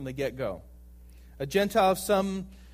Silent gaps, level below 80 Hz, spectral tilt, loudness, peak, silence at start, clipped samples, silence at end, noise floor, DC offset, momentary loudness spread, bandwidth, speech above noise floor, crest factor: none; -50 dBFS; -5 dB/octave; -28 LUFS; -12 dBFS; 0 s; under 0.1%; 0 s; -50 dBFS; under 0.1%; 14 LU; 15.5 kHz; 22 dB; 18 dB